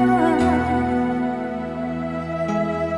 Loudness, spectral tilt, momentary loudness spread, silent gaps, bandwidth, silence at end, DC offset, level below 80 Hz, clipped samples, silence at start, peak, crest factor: -22 LUFS; -7.5 dB/octave; 9 LU; none; 10.5 kHz; 0 s; 0.2%; -40 dBFS; under 0.1%; 0 s; -6 dBFS; 14 dB